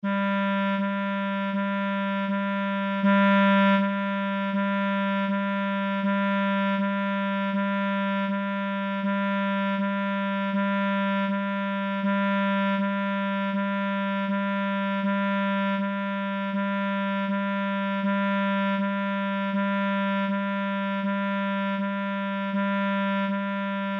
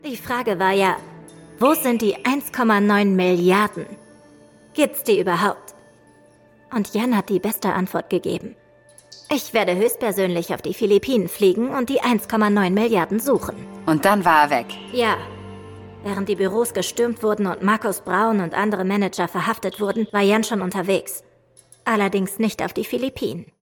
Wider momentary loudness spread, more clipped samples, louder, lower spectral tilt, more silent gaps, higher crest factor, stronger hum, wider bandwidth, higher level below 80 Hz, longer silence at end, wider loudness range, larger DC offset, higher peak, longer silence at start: second, 3 LU vs 11 LU; neither; second, -26 LUFS vs -20 LUFS; first, -8.5 dB/octave vs -5 dB/octave; neither; second, 12 dB vs 18 dB; neither; second, 4.8 kHz vs 19 kHz; second, -82 dBFS vs -58 dBFS; second, 0 s vs 0.15 s; about the same, 3 LU vs 5 LU; neither; second, -12 dBFS vs -2 dBFS; about the same, 0.05 s vs 0.05 s